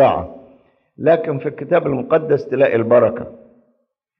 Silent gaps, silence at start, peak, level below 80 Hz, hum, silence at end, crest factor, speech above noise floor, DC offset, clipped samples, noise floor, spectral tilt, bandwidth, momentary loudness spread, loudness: none; 0 s; -2 dBFS; -52 dBFS; none; 0.85 s; 14 dB; 51 dB; under 0.1%; under 0.1%; -67 dBFS; -9.5 dB/octave; 5.8 kHz; 12 LU; -17 LUFS